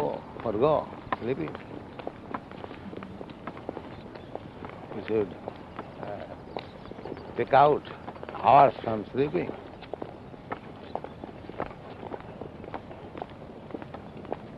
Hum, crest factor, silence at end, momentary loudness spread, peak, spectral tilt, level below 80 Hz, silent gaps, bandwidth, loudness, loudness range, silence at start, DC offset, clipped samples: none; 24 dB; 0 s; 19 LU; -6 dBFS; -8.5 dB/octave; -56 dBFS; none; 6 kHz; -29 LUFS; 15 LU; 0 s; under 0.1%; under 0.1%